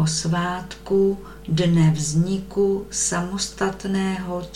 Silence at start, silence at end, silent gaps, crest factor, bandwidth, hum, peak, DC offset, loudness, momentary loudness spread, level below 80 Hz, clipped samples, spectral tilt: 0 s; 0 s; none; 14 dB; 13 kHz; none; -8 dBFS; under 0.1%; -22 LUFS; 8 LU; -44 dBFS; under 0.1%; -5 dB/octave